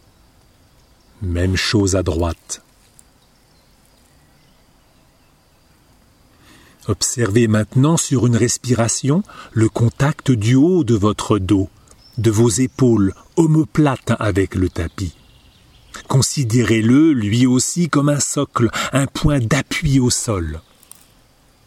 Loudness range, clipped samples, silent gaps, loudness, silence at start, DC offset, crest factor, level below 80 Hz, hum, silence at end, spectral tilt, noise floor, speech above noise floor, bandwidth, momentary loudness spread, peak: 6 LU; under 0.1%; none; -17 LUFS; 1.2 s; under 0.1%; 18 dB; -38 dBFS; none; 1.05 s; -5.5 dB/octave; -54 dBFS; 38 dB; 15.5 kHz; 11 LU; 0 dBFS